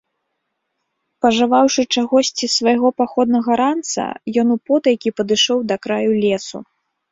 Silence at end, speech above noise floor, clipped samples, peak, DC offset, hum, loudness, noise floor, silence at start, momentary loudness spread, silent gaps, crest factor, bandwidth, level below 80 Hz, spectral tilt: 0.5 s; 57 dB; under 0.1%; -2 dBFS; under 0.1%; none; -17 LUFS; -74 dBFS; 1.25 s; 7 LU; none; 16 dB; 7.8 kHz; -60 dBFS; -3.5 dB/octave